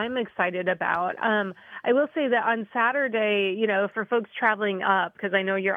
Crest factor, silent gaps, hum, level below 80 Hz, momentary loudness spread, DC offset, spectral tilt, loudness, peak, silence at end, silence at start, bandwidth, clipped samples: 16 dB; none; none; -76 dBFS; 4 LU; under 0.1%; -7 dB/octave; -25 LUFS; -8 dBFS; 0 s; 0 s; 4.5 kHz; under 0.1%